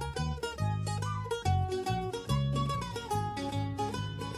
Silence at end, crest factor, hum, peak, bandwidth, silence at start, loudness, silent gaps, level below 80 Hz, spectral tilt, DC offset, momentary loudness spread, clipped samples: 0 s; 16 dB; none; -18 dBFS; 15 kHz; 0 s; -34 LUFS; none; -44 dBFS; -6 dB/octave; under 0.1%; 4 LU; under 0.1%